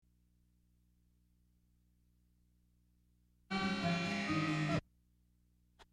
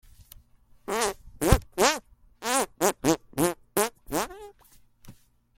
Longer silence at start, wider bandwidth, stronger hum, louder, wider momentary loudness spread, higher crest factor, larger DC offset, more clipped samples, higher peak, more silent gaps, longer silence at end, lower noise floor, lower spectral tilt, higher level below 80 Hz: first, 3.5 s vs 0.9 s; second, 11.5 kHz vs 17 kHz; first, 60 Hz at -70 dBFS vs none; second, -37 LUFS vs -27 LUFS; second, 4 LU vs 10 LU; second, 18 dB vs 28 dB; neither; neither; second, -24 dBFS vs -2 dBFS; neither; second, 0.1 s vs 0.45 s; first, -73 dBFS vs -58 dBFS; first, -5.5 dB/octave vs -4 dB/octave; second, -68 dBFS vs -40 dBFS